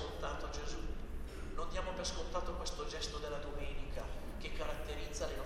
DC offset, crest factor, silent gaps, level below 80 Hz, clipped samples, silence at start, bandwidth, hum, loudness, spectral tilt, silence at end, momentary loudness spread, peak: under 0.1%; 14 dB; none; -44 dBFS; under 0.1%; 0 s; 14.5 kHz; none; -43 LUFS; -4 dB/octave; 0 s; 6 LU; -24 dBFS